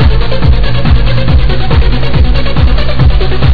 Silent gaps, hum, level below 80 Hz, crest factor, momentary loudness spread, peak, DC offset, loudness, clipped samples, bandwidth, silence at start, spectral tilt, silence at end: none; none; -10 dBFS; 6 dB; 1 LU; 0 dBFS; under 0.1%; -11 LUFS; 7%; 5 kHz; 0 s; -8.5 dB/octave; 0 s